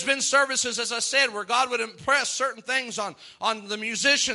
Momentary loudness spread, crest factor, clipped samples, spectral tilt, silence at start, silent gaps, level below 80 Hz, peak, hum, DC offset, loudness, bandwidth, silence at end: 9 LU; 18 dB; under 0.1%; 0 dB/octave; 0 s; none; -70 dBFS; -6 dBFS; none; under 0.1%; -24 LUFS; 11.5 kHz; 0 s